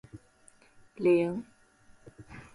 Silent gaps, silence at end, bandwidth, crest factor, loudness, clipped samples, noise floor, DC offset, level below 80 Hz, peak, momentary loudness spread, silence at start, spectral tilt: none; 0.1 s; 11.5 kHz; 18 dB; -28 LUFS; under 0.1%; -61 dBFS; under 0.1%; -64 dBFS; -16 dBFS; 24 LU; 0.15 s; -7.5 dB/octave